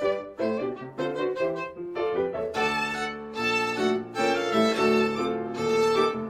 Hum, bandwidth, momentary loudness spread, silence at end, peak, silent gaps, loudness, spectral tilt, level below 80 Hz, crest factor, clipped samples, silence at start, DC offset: none; 15.5 kHz; 9 LU; 0 s; -10 dBFS; none; -26 LUFS; -4.5 dB/octave; -62 dBFS; 16 dB; under 0.1%; 0 s; under 0.1%